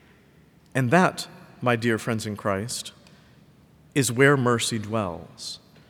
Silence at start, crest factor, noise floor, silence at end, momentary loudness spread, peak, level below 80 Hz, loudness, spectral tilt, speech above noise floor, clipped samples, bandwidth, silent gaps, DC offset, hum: 0.75 s; 22 dB; -56 dBFS; 0.35 s; 17 LU; -4 dBFS; -66 dBFS; -24 LUFS; -5 dB/octave; 32 dB; under 0.1%; 19.5 kHz; none; under 0.1%; none